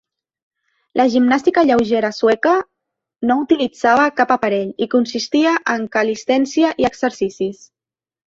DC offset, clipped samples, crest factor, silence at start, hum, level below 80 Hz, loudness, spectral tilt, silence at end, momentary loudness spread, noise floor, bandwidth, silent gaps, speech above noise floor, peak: under 0.1%; under 0.1%; 16 dB; 0.95 s; none; -56 dBFS; -17 LUFS; -4.5 dB/octave; 0.75 s; 7 LU; -79 dBFS; 7.8 kHz; none; 63 dB; -2 dBFS